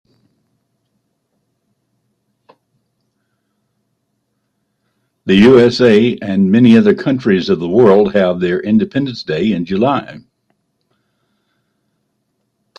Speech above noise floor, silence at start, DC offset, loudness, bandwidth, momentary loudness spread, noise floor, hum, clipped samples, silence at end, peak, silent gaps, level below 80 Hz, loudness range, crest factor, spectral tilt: 57 dB; 5.25 s; under 0.1%; -12 LUFS; 8.4 kHz; 10 LU; -68 dBFS; none; under 0.1%; 2.6 s; 0 dBFS; none; -52 dBFS; 11 LU; 16 dB; -7.5 dB/octave